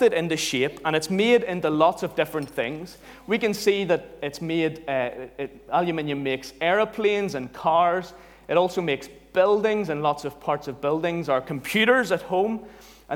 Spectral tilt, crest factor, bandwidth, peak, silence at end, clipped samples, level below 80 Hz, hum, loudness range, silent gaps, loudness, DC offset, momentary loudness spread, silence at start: -4.5 dB/octave; 18 dB; 19 kHz; -6 dBFS; 0 s; under 0.1%; -58 dBFS; none; 3 LU; none; -24 LUFS; under 0.1%; 10 LU; 0 s